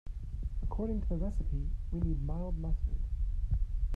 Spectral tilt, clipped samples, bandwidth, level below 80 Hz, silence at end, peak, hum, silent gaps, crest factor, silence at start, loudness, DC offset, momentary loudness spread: -10.5 dB/octave; under 0.1%; 1.9 kHz; -34 dBFS; 0 s; -20 dBFS; none; none; 12 dB; 0.05 s; -37 LUFS; under 0.1%; 4 LU